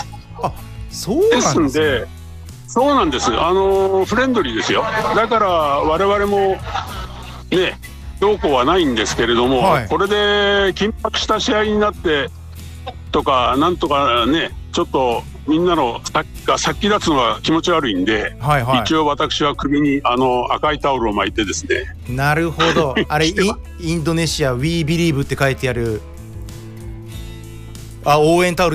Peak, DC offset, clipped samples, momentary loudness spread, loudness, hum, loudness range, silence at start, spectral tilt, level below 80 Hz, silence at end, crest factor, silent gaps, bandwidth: -4 dBFS; under 0.1%; under 0.1%; 18 LU; -17 LUFS; none; 3 LU; 0 s; -4.5 dB/octave; -34 dBFS; 0 s; 14 dB; none; 15.5 kHz